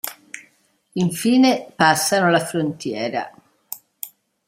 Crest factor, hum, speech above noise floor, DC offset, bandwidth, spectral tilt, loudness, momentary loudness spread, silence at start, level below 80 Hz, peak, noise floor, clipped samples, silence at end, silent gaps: 20 dB; none; 42 dB; under 0.1%; 16 kHz; -4 dB/octave; -19 LUFS; 20 LU; 0.05 s; -66 dBFS; 0 dBFS; -60 dBFS; under 0.1%; 0.4 s; none